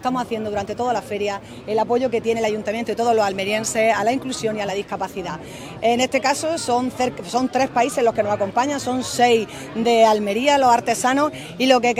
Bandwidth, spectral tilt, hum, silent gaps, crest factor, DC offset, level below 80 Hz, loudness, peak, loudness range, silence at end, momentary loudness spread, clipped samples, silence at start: 16 kHz; -3.5 dB/octave; none; none; 20 dB; under 0.1%; -54 dBFS; -20 LUFS; 0 dBFS; 4 LU; 0 s; 9 LU; under 0.1%; 0 s